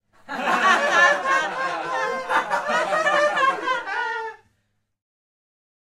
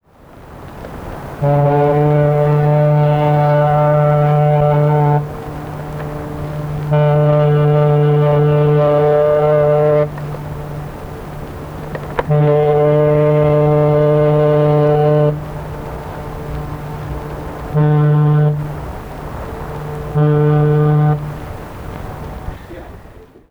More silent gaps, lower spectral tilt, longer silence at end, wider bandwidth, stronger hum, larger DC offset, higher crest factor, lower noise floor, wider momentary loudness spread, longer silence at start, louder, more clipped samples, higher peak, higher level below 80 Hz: neither; second, -2 dB/octave vs -9.5 dB/octave; first, 1.6 s vs 0.25 s; first, 15 kHz vs 4.5 kHz; neither; neither; about the same, 18 dB vs 14 dB; first, -71 dBFS vs -40 dBFS; second, 11 LU vs 16 LU; about the same, 0.3 s vs 0.35 s; second, -21 LUFS vs -13 LUFS; neither; second, -4 dBFS vs 0 dBFS; second, -68 dBFS vs -34 dBFS